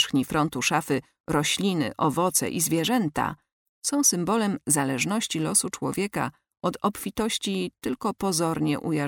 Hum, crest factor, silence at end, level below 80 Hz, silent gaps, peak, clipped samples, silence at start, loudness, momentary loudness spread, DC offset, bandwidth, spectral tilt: none; 18 dB; 0 s; -56 dBFS; 1.20-1.24 s, 3.52-3.82 s; -8 dBFS; under 0.1%; 0 s; -25 LUFS; 7 LU; under 0.1%; 18 kHz; -3.5 dB/octave